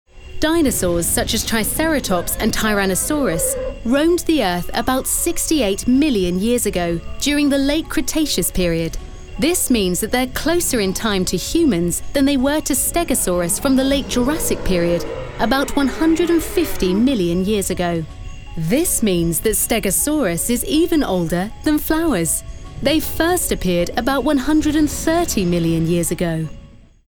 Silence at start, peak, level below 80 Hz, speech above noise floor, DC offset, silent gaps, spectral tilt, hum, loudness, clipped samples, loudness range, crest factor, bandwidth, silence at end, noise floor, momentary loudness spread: 0.15 s; -4 dBFS; -32 dBFS; 24 dB; under 0.1%; none; -4 dB/octave; none; -18 LUFS; under 0.1%; 1 LU; 14 dB; over 20 kHz; 0.35 s; -41 dBFS; 5 LU